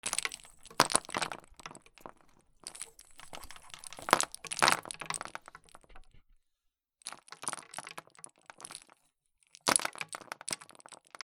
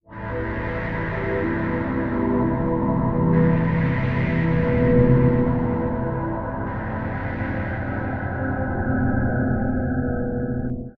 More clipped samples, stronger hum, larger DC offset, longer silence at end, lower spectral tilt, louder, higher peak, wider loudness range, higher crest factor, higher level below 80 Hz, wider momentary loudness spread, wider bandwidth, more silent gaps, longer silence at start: neither; neither; neither; first, 0.3 s vs 0.05 s; second, -1 dB/octave vs -11 dB/octave; second, -33 LUFS vs -23 LUFS; first, 0 dBFS vs -4 dBFS; first, 12 LU vs 6 LU; first, 38 dB vs 18 dB; second, -66 dBFS vs -34 dBFS; first, 24 LU vs 9 LU; first, over 20 kHz vs 4.7 kHz; neither; about the same, 0.05 s vs 0.1 s